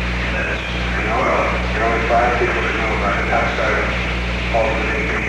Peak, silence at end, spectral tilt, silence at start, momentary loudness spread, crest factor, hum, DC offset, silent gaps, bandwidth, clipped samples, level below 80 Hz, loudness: -4 dBFS; 0 s; -5.5 dB/octave; 0 s; 5 LU; 14 dB; 60 Hz at -25 dBFS; under 0.1%; none; 9.8 kHz; under 0.1%; -26 dBFS; -18 LUFS